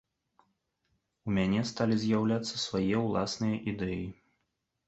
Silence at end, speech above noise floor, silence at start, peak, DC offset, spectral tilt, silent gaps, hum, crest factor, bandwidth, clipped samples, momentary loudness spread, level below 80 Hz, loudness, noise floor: 0.75 s; 51 dB; 1.25 s; -14 dBFS; under 0.1%; -6 dB/octave; none; none; 18 dB; 8.2 kHz; under 0.1%; 7 LU; -58 dBFS; -31 LUFS; -81 dBFS